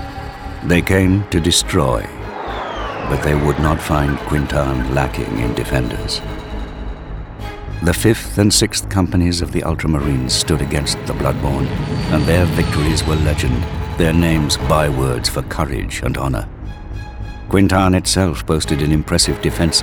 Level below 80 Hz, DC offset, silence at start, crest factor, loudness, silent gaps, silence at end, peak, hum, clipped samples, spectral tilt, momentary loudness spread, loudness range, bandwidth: -26 dBFS; under 0.1%; 0 s; 16 dB; -17 LUFS; none; 0 s; 0 dBFS; none; under 0.1%; -5 dB/octave; 14 LU; 4 LU; over 20 kHz